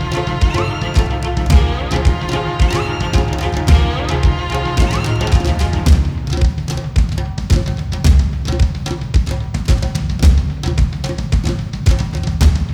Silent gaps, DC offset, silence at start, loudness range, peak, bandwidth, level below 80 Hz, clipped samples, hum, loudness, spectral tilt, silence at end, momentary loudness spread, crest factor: none; under 0.1%; 0 s; 2 LU; 0 dBFS; 13 kHz; -18 dBFS; under 0.1%; none; -17 LUFS; -6 dB/octave; 0 s; 6 LU; 14 dB